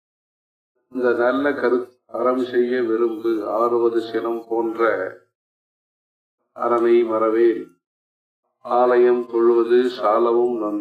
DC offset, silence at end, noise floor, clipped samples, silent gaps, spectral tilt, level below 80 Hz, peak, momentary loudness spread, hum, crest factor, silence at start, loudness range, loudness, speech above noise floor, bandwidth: under 0.1%; 0 s; under -90 dBFS; under 0.1%; 5.35-6.38 s, 7.87-8.43 s; -6.5 dB/octave; -74 dBFS; -6 dBFS; 8 LU; none; 14 dB; 0.95 s; 4 LU; -19 LUFS; over 71 dB; 5 kHz